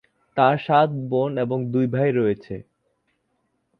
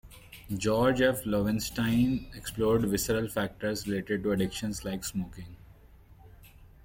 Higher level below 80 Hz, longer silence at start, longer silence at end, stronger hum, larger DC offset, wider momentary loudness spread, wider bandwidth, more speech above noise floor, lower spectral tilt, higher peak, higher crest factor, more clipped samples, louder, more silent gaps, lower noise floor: second, -60 dBFS vs -50 dBFS; first, 0.35 s vs 0.05 s; first, 1.2 s vs 0.2 s; neither; neither; about the same, 12 LU vs 13 LU; second, 5.4 kHz vs 17 kHz; first, 51 dB vs 26 dB; first, -9.5 dB/octave vs -5 dB/octave; first, -2 dBFS vs -10 dBFS; about the same, 20 dB vs 20 dB; neither; first, -22 LUFS vs -29 LUFS; neither; first, -71 dBFS vs -54 dBFS